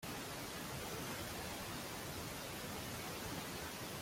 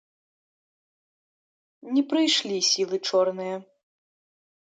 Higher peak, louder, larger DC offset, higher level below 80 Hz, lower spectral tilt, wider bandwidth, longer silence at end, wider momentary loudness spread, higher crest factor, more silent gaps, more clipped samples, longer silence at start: second, -32 dBFS vs -10 dBFS; second, -45 LUFS vs -24 LUFS; neither; first, -62 dBFS vs -82 dBFS; about the same, -3 dB/octave vs -2.5 dB/octave; first, 16.5 kHz vs 9.4 kHz; second, 0 s vs 1.1 s; second, 1 LU vs 11 LU; about the same, 14 dB vs 18 dB; neither; neither; second, 0 s vs 1.85 s